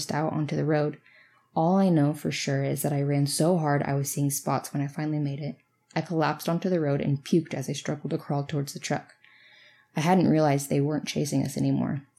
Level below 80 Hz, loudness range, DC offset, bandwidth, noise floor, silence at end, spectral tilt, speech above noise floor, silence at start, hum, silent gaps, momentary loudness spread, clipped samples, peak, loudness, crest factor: -74 dBFS; 3 LU; under 0.1%; 15.5 kHz; -56 dBFS; 0.15 s; -6 dB/octave; 31 dB; 0 s; none; none; 9 LU; under 0.1%; -10 dBFS; -27 LUFS; 16 dB